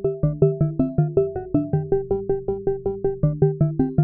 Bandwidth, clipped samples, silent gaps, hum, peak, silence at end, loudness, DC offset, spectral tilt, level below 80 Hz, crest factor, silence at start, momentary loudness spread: 2.8 kHz; under 0.1%; none; none; -6 dBFS; 0 s; -22 LUFS; 0.2%; -15 dB/octave; -38 dBFS; 16 dB; 0 s; 5 LU